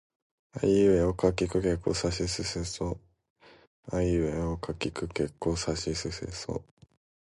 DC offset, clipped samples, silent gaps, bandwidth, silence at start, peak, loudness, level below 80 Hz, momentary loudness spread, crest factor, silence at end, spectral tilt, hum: under 0.1%; under 0.1%; 3.30-3.36 s, 3.67-3.83 s; 11.5 kHz; 0.55 s; -10 dBFS; -29 LUFS; -44 dBFS; 12 LU; 20 dB; 0.75 s; -5.5 dB/octave; none